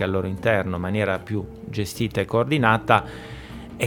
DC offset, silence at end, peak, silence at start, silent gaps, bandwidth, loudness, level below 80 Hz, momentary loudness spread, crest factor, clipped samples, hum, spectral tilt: under 0.1%; 0 s; 0 dBFS; 0 s; none; 19.5 kHz; -23 LUFS; -46 dBFS; 18 LU; 24 dB; under 0.1%; none; -6 dB/octave